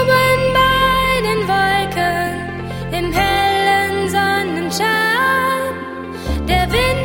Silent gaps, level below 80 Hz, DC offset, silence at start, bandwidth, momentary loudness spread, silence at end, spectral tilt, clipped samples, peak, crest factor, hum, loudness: none; -30 dBFS; under 0.1%; 0 s; 17 kHz; 11 LU; 0 s; -4.5 dB/octave; under 0.1%; -2 dBFS; 14 dB; none; -16 LUFS